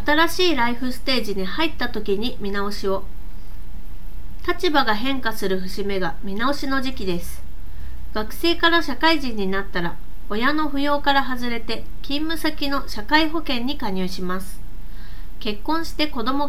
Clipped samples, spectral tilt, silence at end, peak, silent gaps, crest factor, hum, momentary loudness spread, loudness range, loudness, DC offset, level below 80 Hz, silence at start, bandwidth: under 0.1%; -4.5 dB/octave; 0 s; -2 dBFS; none; 20 dB; none; 22 LU; 4 LU; -23 LUFS; 10%; -36 dBFS; 0 s; 18 kHz